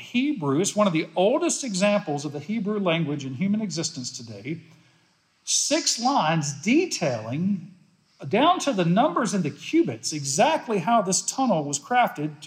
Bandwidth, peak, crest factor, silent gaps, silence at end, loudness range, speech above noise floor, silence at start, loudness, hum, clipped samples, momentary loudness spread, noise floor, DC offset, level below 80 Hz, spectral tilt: 15.5 kHz; -8 dBFS; 16 dB; none; 0 s; 4 LU; 40 dB; 0 s; -24 LUFS; none; under 0.1%; 9 LU; -64 dBFS; under 0.1%; -80 dBFS; -4 dB/octave